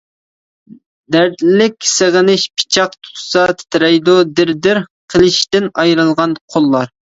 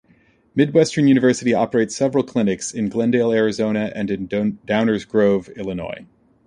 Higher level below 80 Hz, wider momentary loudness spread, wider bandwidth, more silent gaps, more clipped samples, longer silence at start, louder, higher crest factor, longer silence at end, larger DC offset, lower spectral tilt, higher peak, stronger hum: about the same, -50 dBFS vs -54 dBFS; second, 6 LU vs 11 LU; second, 8 kHz vs 10.5 kHz; first, 4.90-5.08 s, 6.41-6.48 s vs none; neither; first, 1.1 s vs 0.55 s; first, -12 LUFS vs -19 LUFS; about the same, 12 dB vs 16 dB; second, 0.15 s vs 0.45 s; neither; second, -4 dB/octave vs -6 dB/octave; about the same, 0 dBFS vs -2 dBFS; neither